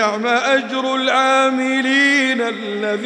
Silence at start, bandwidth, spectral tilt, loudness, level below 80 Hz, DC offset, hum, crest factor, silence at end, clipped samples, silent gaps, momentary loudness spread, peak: 0 s; 10.5 kHz; -3 dB/octave; -16 LUFS; -80 dBFS; under 0.1%; none; 14 dB; 0 s; under 0.1%; none; 7 LU; -4 dBFS